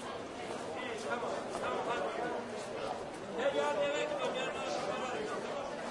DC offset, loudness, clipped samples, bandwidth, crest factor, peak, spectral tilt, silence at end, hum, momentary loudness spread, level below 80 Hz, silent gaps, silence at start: under 0.1%; -37 LUFS; under 0.1%; 11.5 kHz; 16 dB; -20 dBFS; -3.5 dB/octave; 0 s; none; 8 LU; -70 dBFS; none; 0 s